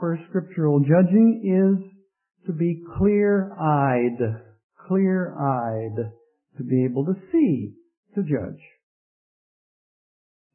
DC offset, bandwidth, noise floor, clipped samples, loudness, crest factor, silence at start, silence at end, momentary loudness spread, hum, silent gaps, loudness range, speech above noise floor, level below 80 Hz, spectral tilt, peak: under 0.1%; 3.1 kHz; under -90 dBFS; under 0.1%; -22 LUFS; 16 dB; 0 s; 2 s; 14 LU; none; 4.63-4.69 s, 7.97-8.03 s; 6 LU; over 69 dB; -54 dBFS; -14 dB/octave; -6 dBFS